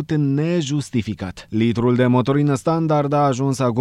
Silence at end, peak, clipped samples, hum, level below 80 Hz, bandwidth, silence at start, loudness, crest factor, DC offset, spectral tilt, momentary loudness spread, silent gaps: 0 s; -4 dBFS; under 0.1%; none; -50 dBFS; 12 kHz; 0 s; -19 LUFS; 14 dB; under 0.1%; -7 dB/octave; 8 LU; none